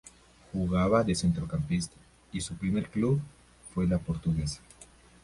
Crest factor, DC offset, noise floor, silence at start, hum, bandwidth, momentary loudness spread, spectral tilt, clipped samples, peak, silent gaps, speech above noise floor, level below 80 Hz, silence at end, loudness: 18 dB; under 0.1%; -55 dBFS; 0.05 s; none; 11.5 kHz; 13 LU; -6.5 dB/octave; under 0.1%; -12 dBFS; none; 27 dB; -46 dBFS; 0.4 s; -30 LUFS